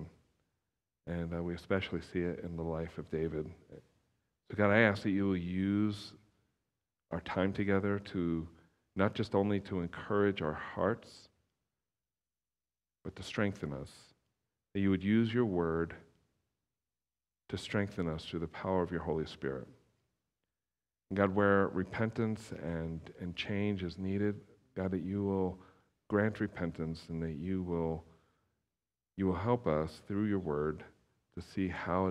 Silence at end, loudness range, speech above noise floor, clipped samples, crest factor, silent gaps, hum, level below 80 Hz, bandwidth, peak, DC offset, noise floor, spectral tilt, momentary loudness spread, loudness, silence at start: 0 s; 6 LU; over 56 dB; under 0.1%; 24 dB; none; none; -60 dBFS; 11 kHz; -12 dBFS; under 0.1%; under -90 dBFS; -7.5 dB/octave; 14 LU; -35 LUFS; 0 s